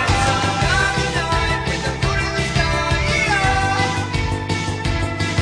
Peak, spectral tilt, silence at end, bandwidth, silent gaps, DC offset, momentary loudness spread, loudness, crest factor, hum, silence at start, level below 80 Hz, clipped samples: -6 dBFS; -4.5 dB/octave; 0 s; 10.5 kHz; none; under 0.1%; 5 LU; -19 LUFS; 14 dB; none; 0 s; -28 dBFS; under 0.1%